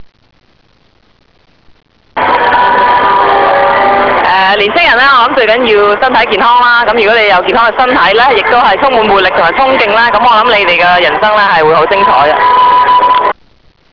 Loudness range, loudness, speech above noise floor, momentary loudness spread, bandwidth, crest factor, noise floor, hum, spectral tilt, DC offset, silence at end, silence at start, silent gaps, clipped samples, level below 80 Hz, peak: 3 LU; -6 LUFS; 42 dB; 3 LU; 5.4 kHz; 8 dB; -49 dBFS; none; -5 dB/octave; 0.3%; 0.6 s; 0 s; none; under 0.1%; -38 dBFS; 0 dBFS